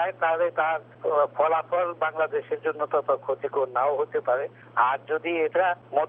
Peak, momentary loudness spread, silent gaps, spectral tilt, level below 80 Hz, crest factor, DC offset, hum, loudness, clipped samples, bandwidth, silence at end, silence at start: -8 dBFS; 5 LU; none; -8 dB/octave; -84 dBFS; 16 dB; under 0.1%; 60 Hz at -55 dBFS; -26 LUFS; under 0.1%; 3.8 kHz; 0 s; 0 s